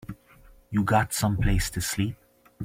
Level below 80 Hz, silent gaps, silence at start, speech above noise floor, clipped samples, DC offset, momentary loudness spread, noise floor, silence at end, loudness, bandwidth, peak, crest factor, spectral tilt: -36 dBFS; none; 0.1 s; 29 dB; under 0.1%; under 0.1%; 21 LU; -54 dBFS; 0 s; -26 LUFS; 16.5 kHz; -8 dBFS; 20 dB; -5 dB/octave